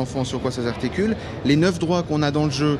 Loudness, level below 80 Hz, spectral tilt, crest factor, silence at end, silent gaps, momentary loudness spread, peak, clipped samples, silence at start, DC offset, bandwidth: -22 LUFS; -42 dBFS; -6 dB/octave; 16 dB; 0 s; none; 6 LU; -6 dBFS; under 0.1%; 0 s; under 0.1%; 11.5 kHz